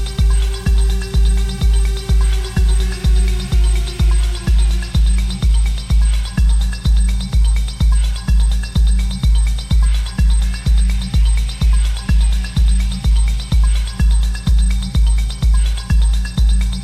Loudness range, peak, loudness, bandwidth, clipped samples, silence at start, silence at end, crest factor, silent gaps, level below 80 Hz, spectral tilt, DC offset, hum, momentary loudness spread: 0 LU; -4 dBFS; -17 LUFS; 11 kHz; under 0.1%; 0 s; 0 s; 8 dB; none; -14 dBFS; -5 dB/octave; under 0.1%; none; 1 LU